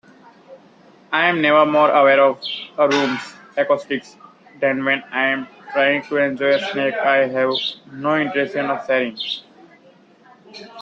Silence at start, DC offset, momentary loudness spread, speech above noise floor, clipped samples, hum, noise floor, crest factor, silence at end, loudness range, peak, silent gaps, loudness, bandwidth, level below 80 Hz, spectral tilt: 0.5 s; under 0.1%; 13 LU; 32 dB; under 0.1%; none; -50 dBFS; 18 dB; 0 s; 4 LU; -2 dBFS; none; -18 LUFS; 7.8 kHz; -68 dBFS; -5 dB/octave